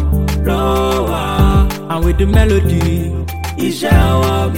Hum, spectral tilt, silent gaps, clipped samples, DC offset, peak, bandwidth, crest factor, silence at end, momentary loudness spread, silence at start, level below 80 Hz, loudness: none; -6.5 dB/octave; none; under 0.1%; 1%; 0 dBFS; 17 kHz; 12 dB; 0 s; 7 LU; 0 s; -18 dBFS; -14 LUFS